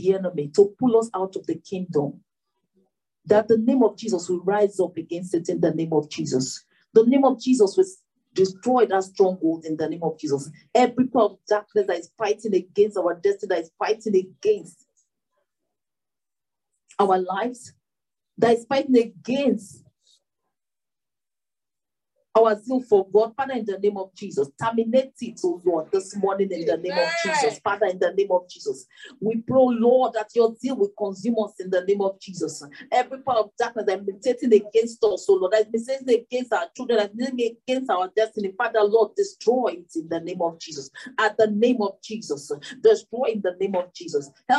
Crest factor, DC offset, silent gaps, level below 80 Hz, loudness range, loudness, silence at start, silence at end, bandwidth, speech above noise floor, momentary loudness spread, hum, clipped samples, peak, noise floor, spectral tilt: 18 dB; under 0.1%; none; -74 dBFS; 5 LU; -23 LUFS; 0 s; 0 s; 11 kHz; over 68 dB; 10 LU; none; under 0.1%; -4 dBFS; under -90 dBFS; -5.5 dB/octave